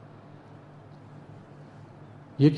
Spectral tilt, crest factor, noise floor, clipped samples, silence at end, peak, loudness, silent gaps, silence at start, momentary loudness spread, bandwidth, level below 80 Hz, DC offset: -9.5 dB/octave; 22 dB; -49 dBFS; under 0.1%; 0 s; -8 dBFS; -27 LUFS; none; 2.4 s; 5 LU; 6.6 kHz; -68 dBFS; under 0.1%